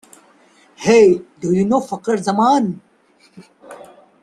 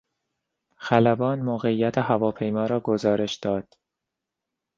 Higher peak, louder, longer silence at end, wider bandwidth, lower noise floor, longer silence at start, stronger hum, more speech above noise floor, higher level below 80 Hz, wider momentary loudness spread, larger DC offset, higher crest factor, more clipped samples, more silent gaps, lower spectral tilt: about the same, -2 dBFS vs -4 dBFS; first, -16 LUFS vs -24 LUFS; second, 0.45 s vs 1.15 s; first, 12 kHz vs 7.6 kHz; second, -54 dBFS vs -85 dBFS; about the same, 0.8 s vs 0.8 s; neither; second, 40 dB vs 62 dB; about the same, -58 dBFS vs -62 dBFS; first, 11 LU vs 7 LU; neither; second, 16 dB vs 22 dB; neither; neither; about the same, -6 dB/octave vs -7 dB/octave